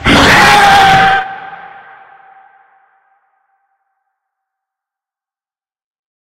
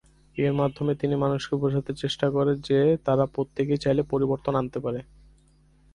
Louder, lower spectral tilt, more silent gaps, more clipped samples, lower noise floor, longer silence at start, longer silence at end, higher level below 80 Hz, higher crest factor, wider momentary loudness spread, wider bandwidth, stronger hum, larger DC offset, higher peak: first, -6 LUFS vs -25 LUFS; second, -3.5 dB/octave vs -7.5 dB/octave; neither; first, 0.2% vs under 0.1%; first, under -90 dBFS vs -59 dBFS; second, 0 s vs 0.35 s; first, 4.65 s vs 0.9 s; first, -34 dBFS vs -54 dBFS; about the same, 14 dB vs 16 dB; first, 22 LU vs 8 LU; first, 16.5 kHz vs 10.5 kHz; neither; neither; first, 0 dBFS vs -10 dBFS